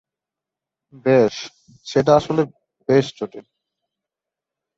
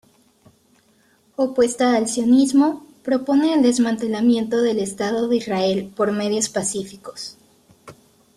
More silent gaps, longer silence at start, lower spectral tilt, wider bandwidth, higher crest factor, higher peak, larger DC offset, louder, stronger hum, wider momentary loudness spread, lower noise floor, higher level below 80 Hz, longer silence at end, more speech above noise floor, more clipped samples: neither; second, 1.05 s vs 1.4 s; first, -6.5 dB/octave vs -4.5 dB/octave; second, 7.8 kHz vs 13 kHz; about the same, 20 dB vs 16 dB; first, -2 dBFS vs -6 dBFS; neither; about the same, -19 LUFS vs -19 LUFS; neither; about the same, 17 LU vs 15 LU; first, -87 dBFS vs -59 dBFS; about the same, -58 dBFS vs -62 dBFS; first, 1.4 s vs 0.45 s; first, 69 dB vs 40 dB; neither